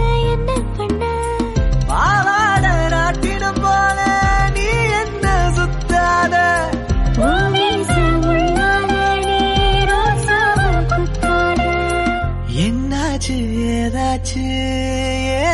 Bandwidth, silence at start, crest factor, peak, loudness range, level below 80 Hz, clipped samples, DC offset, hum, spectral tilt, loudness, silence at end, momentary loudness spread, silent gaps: 11.5 kHz; 0 s; 10 dB; -4 dBFS; 3 LU; -22 dBFS; under 0.1%; under 0.1%; none; -5 dB/octave; -16 LUFS; 0 s; 6 LU; none